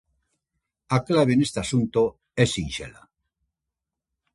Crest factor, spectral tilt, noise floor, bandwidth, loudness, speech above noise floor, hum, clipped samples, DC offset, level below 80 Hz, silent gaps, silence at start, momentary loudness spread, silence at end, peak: 22 dB; -5.5 dB/octave; -86 dBFS; 11.5 kHz; -23 LUFS; 63 dB; none; under 0.1%; under 0.1%; -50 dBFS; none; 0.9 s; 11 LU; 1.45 s; -4 dBFS